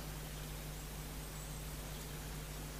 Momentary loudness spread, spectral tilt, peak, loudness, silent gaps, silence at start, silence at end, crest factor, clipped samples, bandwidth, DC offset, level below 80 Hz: 1 LU; -4 dB/octave; -32 dBFS; -46 LUFS; none; 0 s; 0 s; 12 dB; under 0.1%; 15.5 kHz; under 0.1%; -50 dBFS